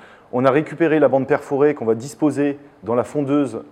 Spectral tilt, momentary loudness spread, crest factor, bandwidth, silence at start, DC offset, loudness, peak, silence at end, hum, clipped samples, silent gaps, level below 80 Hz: -7 dB/octave; 7 LU; 18 dB; 10.5 kHz; 0.35 s; under 0.1%; -19 LUFS; -2 dBFS; 0.05 s; none; under 0.1%; none; -64 dBFS